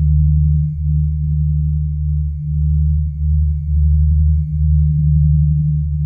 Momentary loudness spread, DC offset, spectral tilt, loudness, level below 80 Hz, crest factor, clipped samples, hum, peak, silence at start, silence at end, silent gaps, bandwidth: 5 LU; under 0.1%; -14.5 dB/octave; -16 LUFS; -16 dBFS; 10 dB; under 0.1%; none; -4 dBFS; 0 s; 0 s; none; 0.3 kHz